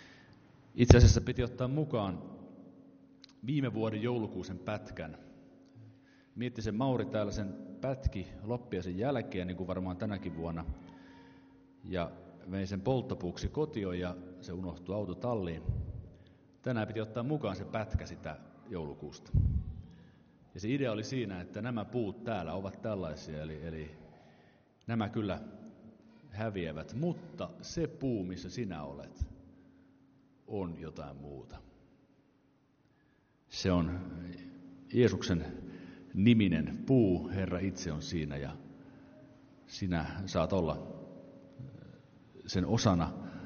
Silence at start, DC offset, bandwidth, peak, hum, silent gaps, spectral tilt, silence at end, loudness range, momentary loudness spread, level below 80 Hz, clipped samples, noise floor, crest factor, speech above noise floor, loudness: 0 s; under 0.1%; 6.8 kHz; -6 dBFS; none; none; -6.5 dB/octave; 0 s; 9 LU; 20 LU; -46 dBFS; under 0.1%; -69 dBFS; 28 dB; 36 dB; -35 LUFS